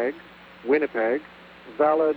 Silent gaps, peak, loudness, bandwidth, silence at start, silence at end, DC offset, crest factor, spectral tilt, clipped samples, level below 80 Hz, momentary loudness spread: none; -8 dBFS; -24 LUFS; 5 kHz; 0 s; 0 s; under 0.1%; 16 dB; -7.5 dB/octave; under 0.1%; -66 dBFS; 21 LU